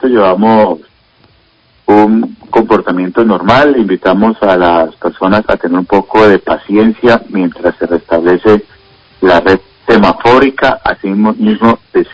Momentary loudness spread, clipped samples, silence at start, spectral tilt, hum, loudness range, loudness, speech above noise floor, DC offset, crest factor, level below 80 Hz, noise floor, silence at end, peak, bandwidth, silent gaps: 6 LU; 2%; 0 s; -7.5 dB/octave; none; 2 LU; -9 LUFS; 41 dB; under 0.1%; 10 dB; -38 dBFS; -49 dBFS; 0.1 s; 0 dBFS; 8 kHz; none